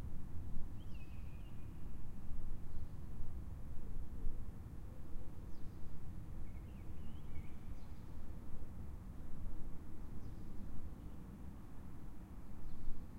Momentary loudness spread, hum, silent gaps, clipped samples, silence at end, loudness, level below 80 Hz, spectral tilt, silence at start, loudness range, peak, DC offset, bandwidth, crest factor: 3 LU; none; none; under 0.1%; 0 s; -53 LUFS; -46 dBFS; -7.5 dB/octave; 0 s; 2 LU; -24 dBFS; under 0.1%; 3 kHz; 14 dB